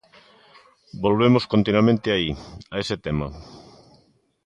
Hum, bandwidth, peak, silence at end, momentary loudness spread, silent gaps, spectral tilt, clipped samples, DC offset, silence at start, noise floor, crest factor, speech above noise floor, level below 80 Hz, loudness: none; 9.4 kHz; -4 dBFS; 0.85 s; 17 LU; none; -7 dB/octave; under 0.1%; under 0.1%; 0.95 s; -61 dBFS; 18 dB; 40 dB; -46 dBFS; -21 LUFS